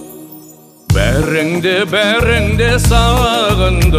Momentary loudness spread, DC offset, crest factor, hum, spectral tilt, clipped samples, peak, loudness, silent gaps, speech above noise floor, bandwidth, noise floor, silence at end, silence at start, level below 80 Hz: 4 LU; under 0.1%; 12 dB; none; -5 dB/octave; under 0.1%; 0 dBFS; -12 LUFS; none; 27 dB; 15.5 kHz; -39 dBFS; 0 s; 0 s; -18 dBFS